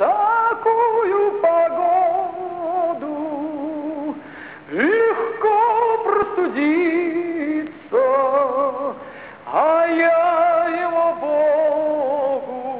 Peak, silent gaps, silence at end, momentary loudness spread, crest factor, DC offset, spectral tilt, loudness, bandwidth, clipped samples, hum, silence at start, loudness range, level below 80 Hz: -6 dBFS; none; 0 s; 10 LU; 12 dB; 0.1%; -8.5 dB/octave; -19 LUFS; 4 kHz; under 0.1%; none; 0 s; 4 LU; -64 dBFS